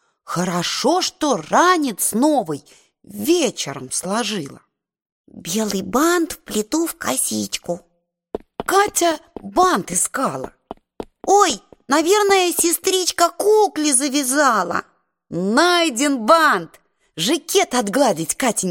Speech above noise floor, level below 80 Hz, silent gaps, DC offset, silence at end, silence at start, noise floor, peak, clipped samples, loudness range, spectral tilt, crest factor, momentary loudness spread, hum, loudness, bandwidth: 19 dB; -54 dBFS; 5.12-5.24 s; under 0.1%; 0 s; 0.25 s; -37 dBFS; 0 dBFS; under 0.1%; 6 LU; -2.5 dB/octave; 18 dB; 14 LU; none; -18 LUFS; 17 kHz